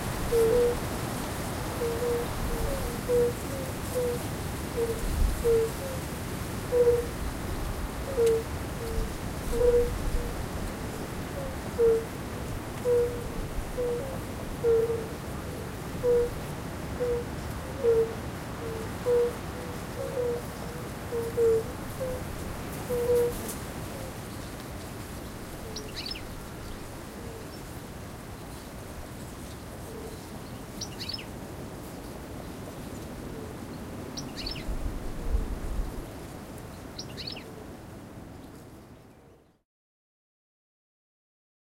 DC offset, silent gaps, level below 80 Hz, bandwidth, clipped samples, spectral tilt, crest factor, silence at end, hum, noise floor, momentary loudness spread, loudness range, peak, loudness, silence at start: under 0.1%; none; -40 dBFS; 16 kHz; under 0.1%; -5.5 dB/octave; 18 dB; 2.25 s; none; -57 dBFS; 15 LU; 12 LU; -12 dBFS; -32 LUFS; 0 s